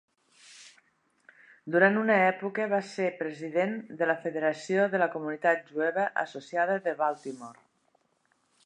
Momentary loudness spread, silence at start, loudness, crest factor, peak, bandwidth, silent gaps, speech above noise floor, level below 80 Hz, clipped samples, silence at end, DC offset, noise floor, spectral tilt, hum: 10 LU; 0.5 s; -28 LUFS; 22 dB; -8 dBFS; 10.5 kHz; none; 44 dB; -86 dBFS; under 0.1%; 1.15 s; under 0.1%; -72 dBFS; -6 dB/octave; none